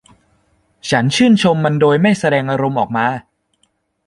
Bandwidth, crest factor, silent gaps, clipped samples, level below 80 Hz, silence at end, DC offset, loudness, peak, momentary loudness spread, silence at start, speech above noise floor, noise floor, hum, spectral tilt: 11.5 kHz; 14 dB; none; under 0.1%; -52 dBFS; 0.85 s; under 0.1%; -14 LUFS; -2 dBFS; 7 LU; 0.85 s; 50 dB; -63 dBFS; none; -6 dB/octave